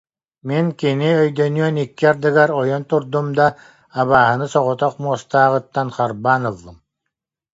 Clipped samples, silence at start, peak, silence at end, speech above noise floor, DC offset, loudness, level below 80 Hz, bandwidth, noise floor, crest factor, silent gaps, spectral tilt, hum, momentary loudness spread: under 0.1%; 0.45 s; 0 dBFS; 0.8 s; 63 dB; under 0.1%; -17 LUFS; -56 dBFS; 8 kHz; -80 dBFS; 18 dB; none; -7 dB/octave; none; 8 LU